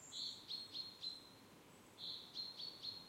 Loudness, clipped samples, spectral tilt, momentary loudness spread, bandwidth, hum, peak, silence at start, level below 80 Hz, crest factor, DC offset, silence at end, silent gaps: -48 LUFS; under 0.1%; -1.5 dB/octave; 16 LU; 16 kHz; none; -36 dBFS; 0 s; -84 dBFS; 16 dB; under 0.1%; 0 s; none